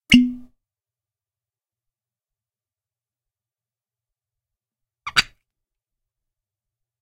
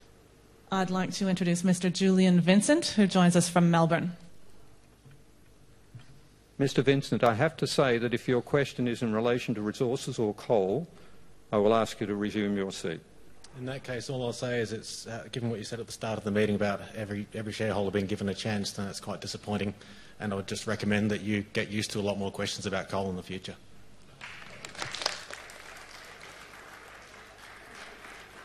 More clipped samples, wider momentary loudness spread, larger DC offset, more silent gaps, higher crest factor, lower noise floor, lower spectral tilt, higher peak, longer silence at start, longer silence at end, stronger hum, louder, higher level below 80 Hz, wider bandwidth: neither; about the same, 21 LU vs 22 LU; neither; neither; about the same, 28 dB vs 24 dB; first, under -90 dBFS vs -58 dBFS; second, -3 dB/octave vs -5.5 dB/octave; first, 0 dBFS vs -6 dBFS; second, 0.1 s vs 0.7 s; first, 1.8 s vs 0 s; neither; first, -19 LUFS vs -29 LUFS; first, -48 dBFS vs -62 dBFS; about the same, 14.5 kHz vs 13.5 kHz